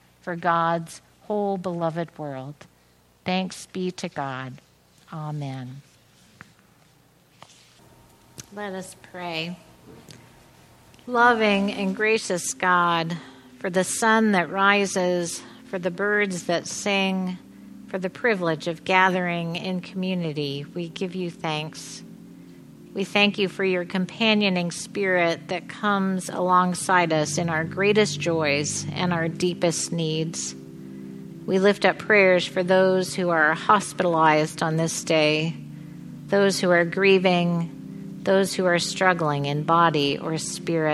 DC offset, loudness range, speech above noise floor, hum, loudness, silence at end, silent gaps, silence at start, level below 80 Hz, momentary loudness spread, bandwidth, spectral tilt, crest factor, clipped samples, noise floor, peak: under 0.1%; 15 LU; 36 dB; none; -23 LUFS; 0 s; none; 0.25 s; -66 dBFS; 16 LU; 13 kHz; -4.5 dB/octave; 22 dB; under 0.1%; -59 dBFS; -2 dBFS